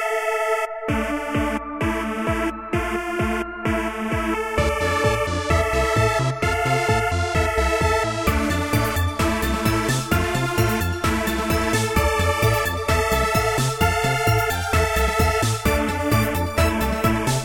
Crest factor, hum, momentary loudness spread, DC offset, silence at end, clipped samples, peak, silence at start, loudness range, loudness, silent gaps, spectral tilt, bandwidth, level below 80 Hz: 16 dB; none; 5 LU; under 0.1%; 0 s; under 0.1%; -6 dBFS; 0 s; 4 LU; -21 LUFS; none; -5 dB/octave; 17.5 kHz; -30 dBFS